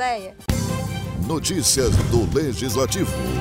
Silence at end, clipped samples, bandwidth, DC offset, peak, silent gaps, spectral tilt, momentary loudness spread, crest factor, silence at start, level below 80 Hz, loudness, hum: 0 s; under 0.1%; 16 kHz; under 0.1%; -6 dBFS; none; -4.5 dB/octave; 9 LU; 14 dB; 0 s; -32 dBFS; -21 LUFS; none